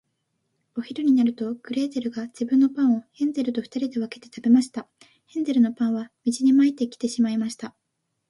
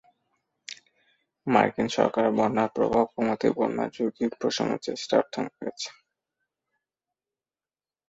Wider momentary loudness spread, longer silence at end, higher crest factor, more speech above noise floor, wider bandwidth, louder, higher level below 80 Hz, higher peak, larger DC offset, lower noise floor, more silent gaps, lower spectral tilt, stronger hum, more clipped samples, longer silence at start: about the same, 13 LU vs 14 LU; second, 0.6 s vs 2.2 s; second, 16 dB vs 24 dB; second, 55 dB vs over 65 dB; first, 11.5 kHz vs 8 kHz; first, -23 LUFS vs -26 LUFS; second, -72 dBFS vs -64 dBFS; second, -8 dBFS vs -4 dBFS; neither; second, -78 dBFS vs under -90 dBFS; neither; about the same, -5.5 dB/octave vs -5 dB/octave; neither; neither; about the same, 0.75 s vs 0.7 s